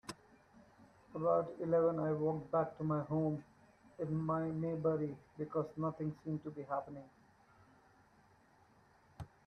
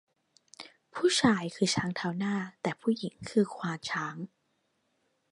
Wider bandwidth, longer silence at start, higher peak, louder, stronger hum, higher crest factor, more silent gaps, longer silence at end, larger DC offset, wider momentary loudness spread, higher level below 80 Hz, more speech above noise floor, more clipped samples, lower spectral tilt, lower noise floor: about the same, 11.5 kHz vs 11.5 kHz; second, 0.05 s vs 0.6 s; second, -20 dBFS vs -8 dBFS; second, -38 LUFS vs -30 LUFS; neither; second, 18 dB vs 24 dB; neither; second, 0.2 s vs 1.05 s; neither; second, 15 LU vs 18 LU; second, -72 dBFS vs -66 dBFS; second, 31 dB vs 46 dB; neither; first, -9 dB/octave vs -4.5 dB/octave; second, -68 dBFS vs -76 dBFS